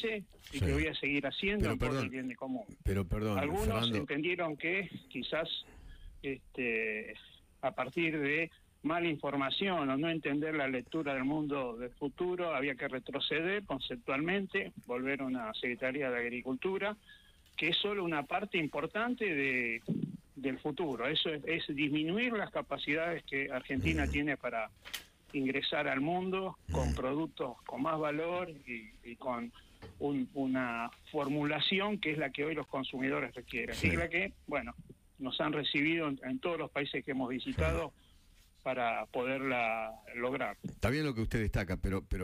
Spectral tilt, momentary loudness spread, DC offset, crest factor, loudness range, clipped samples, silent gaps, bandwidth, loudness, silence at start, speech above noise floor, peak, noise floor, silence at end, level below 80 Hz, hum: -6 dB/octave; 9 LU; under 0.1%; 18 dB; 3 LU; under 0.1%; none; 15.5 kHz; -35 LUFS; 0 s; 27 dB; -18 dBFS; -63 dBFS; 0 s; -50 dBFS; none